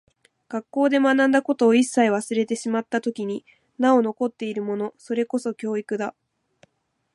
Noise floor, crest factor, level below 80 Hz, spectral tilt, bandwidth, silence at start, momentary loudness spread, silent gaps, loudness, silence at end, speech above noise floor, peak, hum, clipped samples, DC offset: -68 dBFS; 16 dB; -76 dBFS; -5 dB/octave; 11.5 kHz; 0.5 s; 12 LU; none; -23 LUFS; 1.05 s; 46 dB; -6 dBFS; none; under 0.1%; under 0.1%